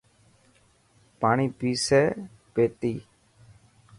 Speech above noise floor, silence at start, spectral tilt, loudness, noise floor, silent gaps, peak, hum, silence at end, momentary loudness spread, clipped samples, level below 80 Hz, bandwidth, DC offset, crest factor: 38 dB; 1.2 s; -5 dB/octave; -25 LUFS; -62 dBFS; none; -8 dBFS; none; 0.95 s; 11 LU; under 0.1%; -60 dBFS; 11.5 kHz; under 0.1%; 20 dB